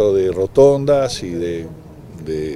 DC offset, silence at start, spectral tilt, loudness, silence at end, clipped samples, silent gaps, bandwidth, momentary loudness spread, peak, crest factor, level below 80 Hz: under 0.1%; 0 s; -6.5 dB/octave; -16 LUFS; 0 s; under 0.1%; none; 12 kHz; 16 LU; -2 dBFS; 16 dB; -42 dBFS